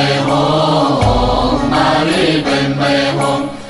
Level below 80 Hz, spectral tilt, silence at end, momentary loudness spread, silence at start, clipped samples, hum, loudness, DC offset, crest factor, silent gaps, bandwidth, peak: -28 dBFS; -5.5 dB/octave; 0 s; 2 LU; 0 s; under 0.1%; none; -13 LUFS; under 0.1%; 12 dB; none; 11.5 kHz; -2 dBFS